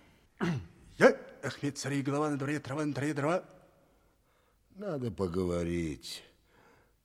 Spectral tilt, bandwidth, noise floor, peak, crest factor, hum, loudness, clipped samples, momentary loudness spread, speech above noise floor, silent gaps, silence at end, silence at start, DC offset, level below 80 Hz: -6 dB/octave; 15 kHz; -69 dBFS; -8 dBFS; 26 dB; none; -33 LUFS; under 0.1%; 15 LU; 36 dB; none; 0.8 s; 0.4 s; under 0.1%; -60 dBFS